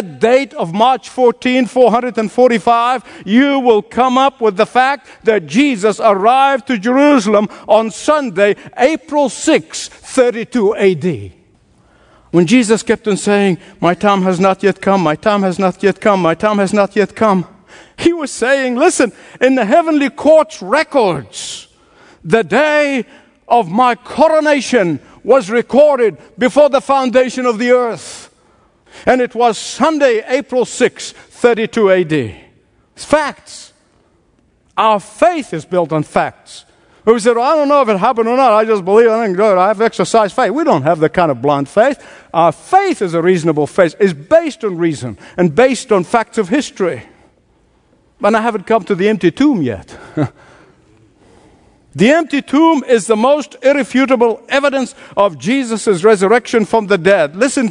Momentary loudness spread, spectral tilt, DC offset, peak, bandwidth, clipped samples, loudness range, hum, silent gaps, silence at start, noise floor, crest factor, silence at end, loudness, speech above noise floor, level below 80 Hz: 8 LU; -5 dB/octave; under 0.1%; 0 dBFS; 11 kHz; under 0.1%; 4 LU; none; none; 0 s; -55 dBFS; 14 dB; 0 s; -13 LUFS; 42 dB; -52 dBFS